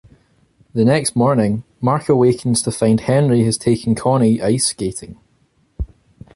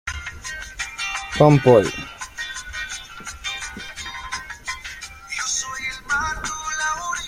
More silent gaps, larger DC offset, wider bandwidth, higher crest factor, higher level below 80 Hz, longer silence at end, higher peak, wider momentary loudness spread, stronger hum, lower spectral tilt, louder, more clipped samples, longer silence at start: neither; neither; second, 11.5 kHz vs 16 kHz; second, 14 dB vs 22 dB; about the same, -40 dBFS vs -44 dBFS; first, 0.5 s vs 0 s; about the same, -2 dBFS vs -2 dBFS; second, 12 LU vs 16 LU; neither; first, -5.5 dB/octave vs -4 dB/octave; first, -16 LUFS vs -23 LUFS; neither; first, 0.75 s vs 0.05 s